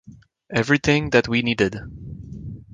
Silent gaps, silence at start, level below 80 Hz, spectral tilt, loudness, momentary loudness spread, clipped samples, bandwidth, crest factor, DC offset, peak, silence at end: none; 0.1 s; -44 dBFS; -5.5 dB/octave; -20 LUFS; 19 LU; under 0.1%; 9.8 kHz; 20 dB; under 0.1%; -2 dBFS; 0.1 s